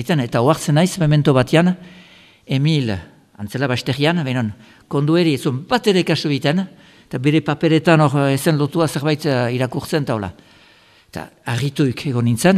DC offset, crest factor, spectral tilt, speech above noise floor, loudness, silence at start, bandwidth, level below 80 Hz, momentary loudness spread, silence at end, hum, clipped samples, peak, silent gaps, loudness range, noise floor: under 0.1%; 18 dB; -6 dB/octave; 33 dB; -18 LUFS; 0 s; 14.5 kHz; -50 dBFS; 13 LU; 0 s; none; under 0.1%; 0 dBFS; none; 4 LU; -50 dBFS